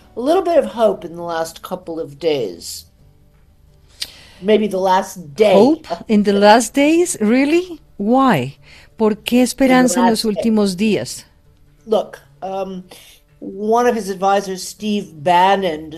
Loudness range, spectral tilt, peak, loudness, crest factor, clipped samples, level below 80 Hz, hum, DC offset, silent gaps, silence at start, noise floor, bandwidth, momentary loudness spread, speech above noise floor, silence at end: 9 LU; -4.5 dB/octave; 0 dBFS; -16 LUFS; 16 dB; under 0.1%; -50 dBFS; none; under 0.1%; none; 0.15 s; -50 dBFS; 14.5 kHz; 17 LU; 34 dB; 0 s